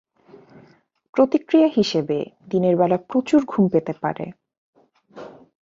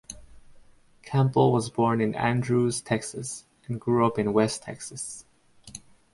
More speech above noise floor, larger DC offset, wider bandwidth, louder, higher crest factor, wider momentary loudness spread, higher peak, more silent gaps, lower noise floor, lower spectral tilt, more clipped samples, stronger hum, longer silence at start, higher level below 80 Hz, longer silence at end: first, 35 dB vs 29 dB; neither; second, 7.8 kHz vs 11.5 kHz; first, -20 LUFS vs -26 LUFS; about the same, 18 dB vs 18 dB; second, 16 LU vs 21 LU; first, -4 dBFS vs -8 dBFS; first, 4.58-4.73 s vs none; about the same, -55 dBFS vs -54 dBFS; about the same, -7 dB/octave vs -6 dB/octave; neither; neither; first, 1.15 s vs 0.1 s; about the same, -62 dBFS vs -58 dBFS; about the same, 0.3 s vs 0.35 s